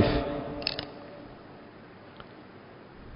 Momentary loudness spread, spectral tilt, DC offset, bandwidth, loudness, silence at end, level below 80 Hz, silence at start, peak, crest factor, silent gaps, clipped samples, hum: 18 LU; -9.5 dB/octave; under 0.1%; 5.6 kHz; -33 LUFS; 0 s; -46 dBFS; 0 s; -8 dBFS; 26 dB; none; under 0.1%; none